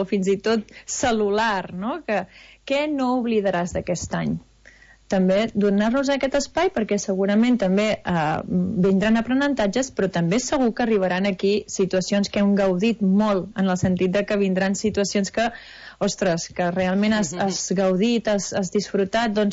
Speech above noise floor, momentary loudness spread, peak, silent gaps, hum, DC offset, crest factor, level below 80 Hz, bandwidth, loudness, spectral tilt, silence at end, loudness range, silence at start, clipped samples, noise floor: 29 dB; 6 LU; -10 dBFS; none; none; under 0.1%; 12 dB; -50 dBFS; 8 kHz; -22 LUFS; -5 dB/octave; 0 s; 3 LU; 0 s; under 0.1%; -51 dBFS